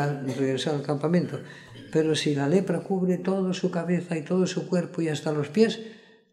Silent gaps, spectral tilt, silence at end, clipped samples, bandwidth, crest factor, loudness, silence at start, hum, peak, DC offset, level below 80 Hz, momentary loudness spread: none; -6.5 dB/octave; 0.35 s; under 0.1%; 11.5 kHz; 18 dB; -26 LUFS; 0 s; none; -8 dBFS; under 0.1%; -70 dBFS; 6 LU